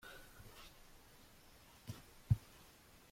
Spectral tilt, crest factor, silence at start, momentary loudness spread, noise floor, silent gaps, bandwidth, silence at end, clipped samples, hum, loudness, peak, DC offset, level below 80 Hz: -6 dB/octave; 26 dB; 0.05 s; 23 LU; -64 dBFS; none; 16.5 kHz; 0.05 s; under 0.1%; none; -45 LUFS; -20 dBFS; under 0.1%; -60 dBFS